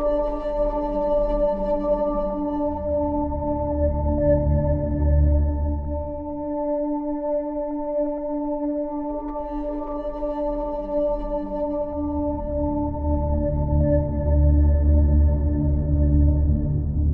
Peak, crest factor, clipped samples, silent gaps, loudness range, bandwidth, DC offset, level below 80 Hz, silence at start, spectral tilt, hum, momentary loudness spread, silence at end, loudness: -8 dBFS; 14 dB; under 0.1%; none; 6 LU; 3.1 kHz; under 0.1%; -26 dBFS; 0 s; -12.5 dB/octave; none; 9 LU; 0 s; -23 LUFS